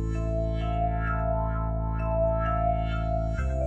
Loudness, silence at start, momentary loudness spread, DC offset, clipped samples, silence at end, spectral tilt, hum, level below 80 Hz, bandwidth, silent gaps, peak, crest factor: -28 LUFS; 0 s; 3 LU; under 0.1%; under 0.1%; 0 s; -9 dB/octave; none; -30 dBFS; 7.4 kHz; none; -14 dBFS; 12 dB